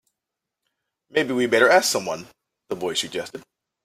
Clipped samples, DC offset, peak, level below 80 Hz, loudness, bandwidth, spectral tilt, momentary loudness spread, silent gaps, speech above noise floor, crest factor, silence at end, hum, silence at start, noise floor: under 0.1%; under 0.1%; -2 dBFS; -68 dBFS; -21 LUFS; 16 kHz; -2.5 dB/octave; 18 LU; none; 63 dB; 22 dB; 0.45 s; none; 1.15 s; -85 dBFS